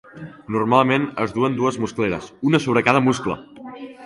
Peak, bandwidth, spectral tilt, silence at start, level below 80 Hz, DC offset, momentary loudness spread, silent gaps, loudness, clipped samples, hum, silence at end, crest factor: 0 dBFS; 11.5 kHz; -6 dB/octave; 0.15 s; -54 dBFS; under 0.1%; 20 LU; none; -20 LUFS; under 0.1%; none; 0 s; 20 dB